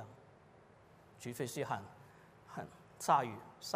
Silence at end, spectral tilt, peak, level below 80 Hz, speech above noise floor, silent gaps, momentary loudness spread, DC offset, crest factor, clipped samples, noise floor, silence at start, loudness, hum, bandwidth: 0 s; -4.5 dB/octave; -18 dBFS; -78 dBFS; 25 dB; none; 27 LU; under 0.1%; 24 dB; under 0.1%; -63 dBFS; 0 s; -39 LUFS; none; 15.5 kHz